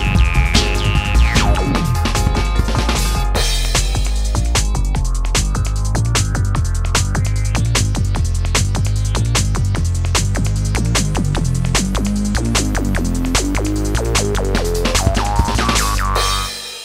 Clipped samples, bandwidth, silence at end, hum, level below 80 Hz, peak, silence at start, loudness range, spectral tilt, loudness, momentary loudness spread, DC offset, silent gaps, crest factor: under 0.1%; 16 kHz; 0 s; none; -18 dBFS; 0 dBFS; 0 s; 1 LU; -4 dB/octave; -17 LUFS; 4 LU; under 0.1%; none; 16 dB